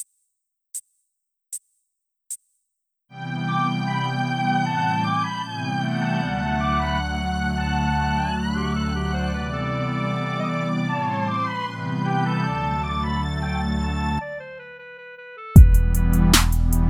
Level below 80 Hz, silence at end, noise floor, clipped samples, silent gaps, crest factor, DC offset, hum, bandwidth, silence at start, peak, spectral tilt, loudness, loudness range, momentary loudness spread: -26 dBFS; 0 s; -79 dBFS; under 0.1%; none; 22 dB; under 0.1%; none; 17 kHz; 0 s; 0 dBFS; -5.5 dB/octave; -22 LUFS; 7 LU; 18 LU